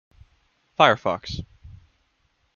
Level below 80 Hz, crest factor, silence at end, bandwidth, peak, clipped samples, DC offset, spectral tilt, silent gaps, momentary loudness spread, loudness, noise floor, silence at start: -52 dBFS; 26 dB; 1.1 s; 7.2 kHz; -2 dBFS; under 0.1%; under 0.1%; -5 dB/octave; none; 20 LU; -21 LUFS; -68 dBFS; 0.8 s